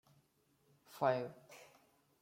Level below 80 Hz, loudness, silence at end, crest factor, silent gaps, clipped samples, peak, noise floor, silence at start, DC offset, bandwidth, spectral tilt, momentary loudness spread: -84 dBFS; -39 LUFS; 0.55 s; 24 dB; none; under 0.1%; -20 dBFS; -76 dBFS; 0.9 s; under 0.1%; 16.5 kHz; -6 dB/octave; 23 LU